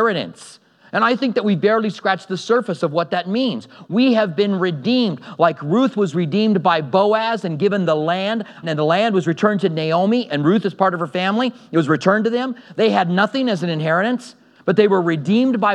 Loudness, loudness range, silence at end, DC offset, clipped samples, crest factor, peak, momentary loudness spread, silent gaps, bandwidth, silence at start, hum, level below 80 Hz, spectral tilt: -18 LUFS; 1 LU; 0 s; under 0.1%; under 0.1%; 18 dB; 0 dBFS; 6 LU; none; 10.5 kHz; 0 s; none; -78 dBFS; -6.5 dB/octave